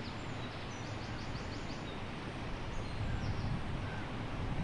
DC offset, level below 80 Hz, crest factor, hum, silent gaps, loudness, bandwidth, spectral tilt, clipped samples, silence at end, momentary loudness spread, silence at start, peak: under 0.1%; -46 dBFS; 14 dB; none; none; -41 LUFS; 11 kHz; -6 dB/octave; under 0.1%; 0 s; 4 LU; 0 s; -26 dBFS